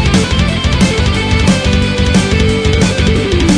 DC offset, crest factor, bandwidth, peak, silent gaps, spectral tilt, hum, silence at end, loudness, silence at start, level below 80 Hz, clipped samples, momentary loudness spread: under 0.1%; 10 dB; 10.5 kHz; 0 dBFS; none; -5 dB/octave; none; 0 s; -11 LUFS; 0 s; -18 dBFS; under 0.1%; 2 LU